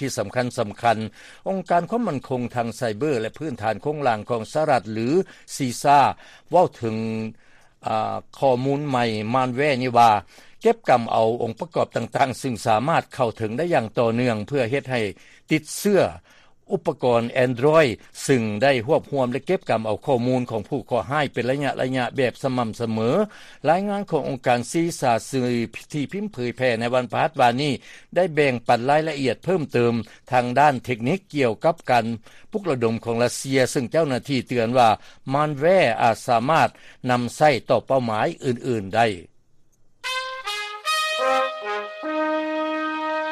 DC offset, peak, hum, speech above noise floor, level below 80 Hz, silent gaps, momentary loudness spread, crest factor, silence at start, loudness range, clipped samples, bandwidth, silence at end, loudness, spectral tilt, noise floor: under 0.1%; -6 dBFS; none; 32 dB; -58 dBFS; none; 9 LU; 16 dB; 0 s; 4 LU; under 0.1%; 15 kHz; 0 s; -22 LUFS; -5.5 dB/octave; -54 dBFS